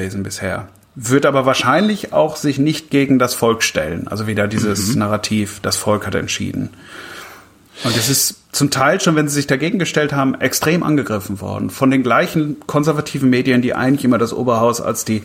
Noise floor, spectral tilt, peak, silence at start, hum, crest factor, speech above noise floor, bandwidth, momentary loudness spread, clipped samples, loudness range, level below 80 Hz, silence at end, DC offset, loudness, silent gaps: -42 dBFS; -4.5 dB/octave; -2 dBFS; 0 s; none; 16 dB; 25 dB; 16.5 kHz; 10 LU; under 0.1%; 4 LU; -50 dBFS; 0 s; under 0.1%; -16 LUFS; none